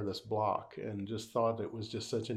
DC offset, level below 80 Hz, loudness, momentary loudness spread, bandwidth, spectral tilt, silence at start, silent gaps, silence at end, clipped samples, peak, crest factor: under 0.1%; -72 dBFS; -37 LUFS; 7 LU; 15.5 kHz; -6 dB/octave; 0 s; none; 0 s; under 0.1%; -20 dBFS; 18 dB